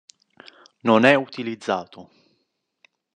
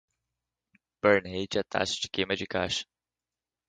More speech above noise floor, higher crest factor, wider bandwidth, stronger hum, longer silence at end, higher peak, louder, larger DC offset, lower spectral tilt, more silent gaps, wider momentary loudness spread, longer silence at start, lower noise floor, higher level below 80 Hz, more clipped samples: second, 53 dB vs over 61 dB; about the same, 24 dB vs 22 dB; about the same, 10 kHz vs 9.4 kHz; neither; first, 1.15 s vs 0.85 s; first, 0 dBFS vs -8 dBFS; first, -20 LUFS vs -29 LUFS; neither; first, -5.5 dB/octave vs -3.5 dB/octave; neither; first, 15 LU vs 7 LU; second, 0.85 s vs 1.05 s; second, -74 dBFS vs under -90 dBFS; second, -76 dBFS vs -58 dBFS; neither